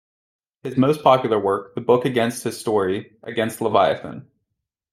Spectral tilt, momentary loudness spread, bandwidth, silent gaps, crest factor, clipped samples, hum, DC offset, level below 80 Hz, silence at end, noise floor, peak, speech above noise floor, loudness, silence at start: -5.5 dB/octave; 12 LU; 16 kHz; none; 20 dB; under 0.1%; none; under 0.1%; -64 dBFS; 0.7 s; -79 dBFS; -2 dBFS; 59 dB; -20 LUFS; 0.65 s